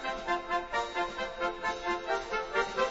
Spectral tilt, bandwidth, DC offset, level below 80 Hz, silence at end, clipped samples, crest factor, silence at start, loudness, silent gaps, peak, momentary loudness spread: -0.5 dB/octave; 7.6 kHz; under 0.1%; -54 dBFS; 0 s; under 0.1%; 18 dB; 0 s; -33 LUFS; none; -16 dBFS; 3 LU